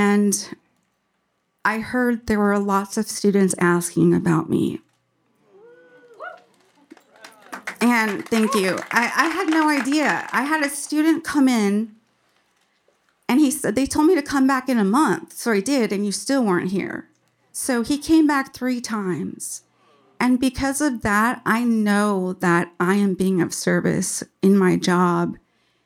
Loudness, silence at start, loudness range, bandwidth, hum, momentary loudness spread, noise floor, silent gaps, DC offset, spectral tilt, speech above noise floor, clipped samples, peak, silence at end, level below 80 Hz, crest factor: -20 LUFS; 0 s; 4 LU; 16.5 kHz; none; 9 LU; -71 dBFS; none; under 0.1%; -5 dB/octave; 51 dB; under 0.1%; -2 dBFS; 0.5 s; -54 dBFS; 20 dB